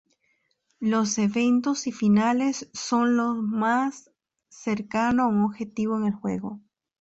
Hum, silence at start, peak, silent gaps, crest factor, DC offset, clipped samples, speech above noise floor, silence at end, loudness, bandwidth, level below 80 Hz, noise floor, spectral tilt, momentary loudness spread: none; 0.8 s; -12 dBFS; none; 14 dB; under 0.1%; under 0.1%; 47 dB; 0.4 s; -25 LUFS; 8 kHz; -62 dBFS; -71 dBFS; -5 dB/octave; 9 LU